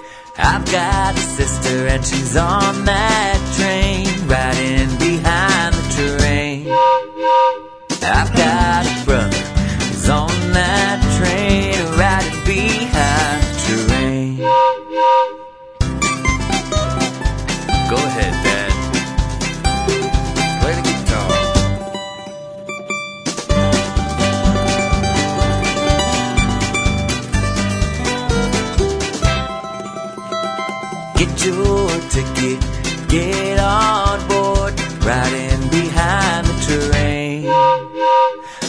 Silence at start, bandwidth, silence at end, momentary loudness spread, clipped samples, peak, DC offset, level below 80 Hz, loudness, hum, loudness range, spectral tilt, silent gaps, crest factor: 0 s; 11 kHz; 0 s; 7 LU; under 0.1%; 0 dBFS; under 0.1%; -24 dBFS; -16 LUFS; none; 4 LU; -4.5 dB/octave; none; 16 dB